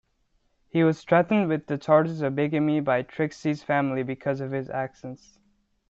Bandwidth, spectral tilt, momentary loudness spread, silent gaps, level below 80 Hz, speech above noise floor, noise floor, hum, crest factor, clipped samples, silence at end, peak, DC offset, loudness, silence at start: 7.8 kHz; -8 dB/octave; 10 LU; none; -64 dBFS; 45 dB; -69 dBFS; none; 20 dB; under 0.1%; 0.75 s; -6 dBFS; under 0.1%; -25 LUFS; 0.75 s